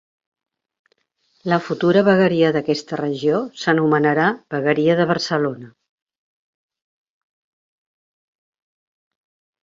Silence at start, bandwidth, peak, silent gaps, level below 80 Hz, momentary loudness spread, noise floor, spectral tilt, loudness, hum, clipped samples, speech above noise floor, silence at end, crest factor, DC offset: 1.45 s; 7.8 kHz; -2 dBFS; none; -64 dBFS; 8 LU; -66 dBFS; -6.5 dB/octave; -18 LUFS; none; under 0.1%; 48 dB; 3.95 s; 18 dB; under 0.1%